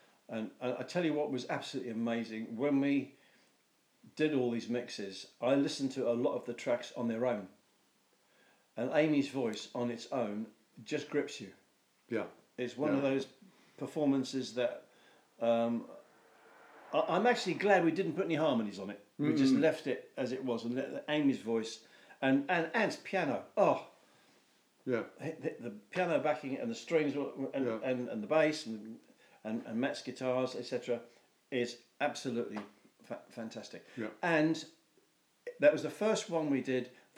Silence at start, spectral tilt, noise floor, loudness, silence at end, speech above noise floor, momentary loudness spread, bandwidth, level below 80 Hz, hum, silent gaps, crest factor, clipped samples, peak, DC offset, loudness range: 0.3 s; -5.5 dB/octave; -73 dBFS; -34 LUFS; 0.25 s; 39 dB; 15 LU; 19.5 kHz; under -90 dBFS; none; none; 22 dB; under 0.1%; -14 dBFS; under 0.1%; 5 LU